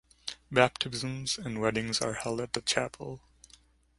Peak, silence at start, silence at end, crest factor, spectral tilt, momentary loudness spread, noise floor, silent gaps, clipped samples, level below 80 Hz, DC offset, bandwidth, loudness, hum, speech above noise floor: -6 dBFS; 0.25 s; 0.8 s; 28 dB; -3.5 dB/octave; 15 LU; -61 dBFS; none; under 0.1%; -60 dBFS; under 0.1%; 11.5 kHz; -30 LUFS; none; 30 dB